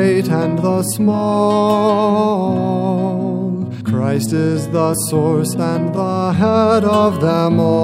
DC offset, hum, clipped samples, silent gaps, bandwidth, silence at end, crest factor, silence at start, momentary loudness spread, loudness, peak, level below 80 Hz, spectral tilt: under 0.1%; none; under 0.1%; none; 16 kHz; 0 s; 14 dB; 0 s; 5 LU; -16 LUFS; 0 dBFS; -54 dBFS; -6.5 dB/octave